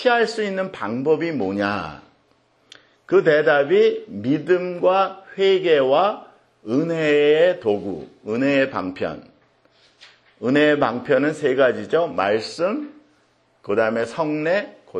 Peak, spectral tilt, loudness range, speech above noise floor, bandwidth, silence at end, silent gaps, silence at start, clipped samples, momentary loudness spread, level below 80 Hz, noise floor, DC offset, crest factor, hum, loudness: -4 dBFS; -6 dB/octave; 4 LU; 42 dB; 9.8 kHz; 0 s; none; 0 s; under 0.1%; 12 LU; -64 dBFS; -61 dBFS; under 0.1%; 18 dB; none; -20 LUFS